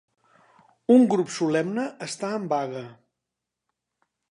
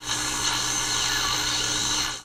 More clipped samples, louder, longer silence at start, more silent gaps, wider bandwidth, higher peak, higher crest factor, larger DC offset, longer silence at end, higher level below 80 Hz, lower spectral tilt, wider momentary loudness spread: neither; about the same, -24 LUFS vs -23 LUFS; first, 0.9 s vs 0 s; neither; second, 11 kHz vs over 20 kHz; first, -6 dBFS vs -10 dBFS; about the same, 20 dB vs 16 dB; neither; first, 1.4 s vs 0 s; second, -78 dBFS vs -44 dBFS; first, -5.5 dB/octave vs -0.5 dB/octave; first, 16 LU vs 1 LU